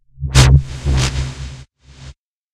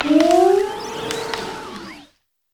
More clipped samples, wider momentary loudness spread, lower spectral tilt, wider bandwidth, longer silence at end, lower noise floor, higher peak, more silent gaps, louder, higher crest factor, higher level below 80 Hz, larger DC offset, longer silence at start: neither; about the same, 19 LU vs 20 LU; about the same, -4.5 dB/octave vs -4 dB/octave; second, 13.5 kHz vs 19 kHz; about the same, 0.4 s vs 0.5 s; second, -41 dBFS vs -56 dBFS; about the same, 0 dBFS vs -2 dBFS; neither; first, -15 LUFS vs -18 LUFS; about the same, 16 dB vs 16 dB; first, -20 dBFS vs -52 dBFS; neither; first, 0.2 s vs 0 s